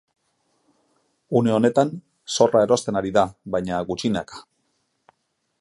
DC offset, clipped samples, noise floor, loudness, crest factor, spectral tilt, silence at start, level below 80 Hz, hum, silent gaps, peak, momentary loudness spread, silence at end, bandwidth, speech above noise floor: under 0.1%; under 0.1%; -73 dBFS; -21 LUFS; 20 dB; -5.5 dB/octave; 1.3 s; -56 dBFS; none; none; -4 dBFS; 10 LU; 1.2 s; 11.5 kHz; 52 dB